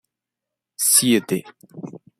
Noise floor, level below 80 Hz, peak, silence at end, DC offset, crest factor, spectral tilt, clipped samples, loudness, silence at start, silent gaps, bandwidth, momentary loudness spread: -85 dBFS; -66 dBFS; -2 dBFS; 0.2 s; under 0.1%; 20 dB; -2.5 dB/octave; under 0.1%; -17 LUFS; 0.8 s; none; 16 kHz; 23 LU